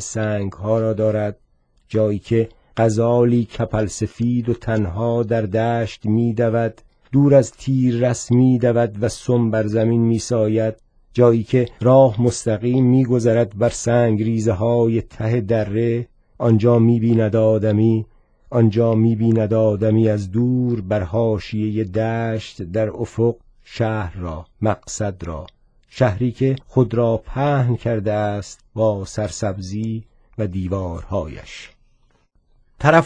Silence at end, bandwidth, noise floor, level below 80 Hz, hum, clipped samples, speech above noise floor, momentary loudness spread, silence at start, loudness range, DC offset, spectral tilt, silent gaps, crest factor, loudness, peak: 0 s; 10 kHz; -59 dBFS; -44 dBFS; none; under 0.1%; 41 dB; 10 LU; 0 s; 7 LU; under 0.1%; -7.5 dB/octave; none; 18 dB; -19 LUFS; 0 dBFS